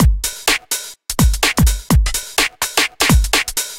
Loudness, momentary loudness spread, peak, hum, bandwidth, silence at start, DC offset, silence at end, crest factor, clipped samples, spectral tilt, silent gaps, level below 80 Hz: -16 LUFS; 4 LU; 0 dBFS; none; 17 kHz; 0 s; under 0.1%; 0 s; 16 dB; under 0.1%; -3 dB/octave; none; -20 dBFS